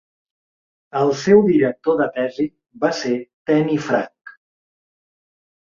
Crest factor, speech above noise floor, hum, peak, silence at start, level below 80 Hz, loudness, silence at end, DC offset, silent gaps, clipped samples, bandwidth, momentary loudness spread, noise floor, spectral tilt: 18 dB; over 73 dB; none; -2 dBFS; 0.95 s; -60 dBFS; -19 LUFS; 1.35 s; under 0.1%; 3.33-3.45 s, 4.21-4.25 s; under 0.1%; 7.4 kHz; 12 LU; under -90 dBFS; -6.5 dB/octave